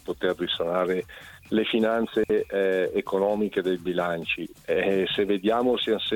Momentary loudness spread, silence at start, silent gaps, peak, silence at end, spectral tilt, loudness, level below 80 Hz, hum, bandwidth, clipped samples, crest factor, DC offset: 5 LU; 0.05 s; none; -10 dBFS; 0 s; -6 dB/octave; -25 LUFS; -58 dBFS; none; 18 kHz; under 0.1%; 16 dB; under 0.1%